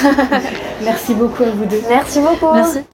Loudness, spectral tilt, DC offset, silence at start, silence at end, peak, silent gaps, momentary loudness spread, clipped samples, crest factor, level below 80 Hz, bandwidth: -14 LUFS; -5 dB/octave; under 0.1%; 0 s; 0.1 s; 0 dBFS; none; 7 LU; under 0.1%; 14 dB; -42 dBFS; 17 kHz